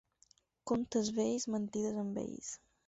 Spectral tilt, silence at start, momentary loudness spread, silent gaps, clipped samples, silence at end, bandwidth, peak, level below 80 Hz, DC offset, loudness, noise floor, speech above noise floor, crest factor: -6.5 dB/octave; 0.65 s; 11 LU; none; under 0.1%; 0.3 s; 8 kHz; -22 dBFS; -70 dBFS; under 0.1%; -37 LUFS; -70 dBFS; 34 dB; 16 dB